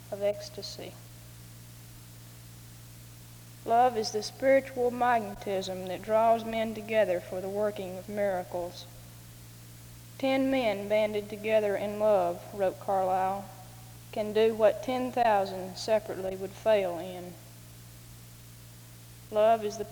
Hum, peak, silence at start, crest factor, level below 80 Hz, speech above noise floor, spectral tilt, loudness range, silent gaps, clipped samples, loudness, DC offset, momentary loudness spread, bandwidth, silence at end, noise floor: none; -12 dBFS; 0 s; 18 dB; -60 dBFS; 21 dB; -5 dB/octave; 6 LU; none; under 0.1%; -29 LUFS; under 0.1%; 23 LU; over 20 kHz; 0 s; -49 dBFS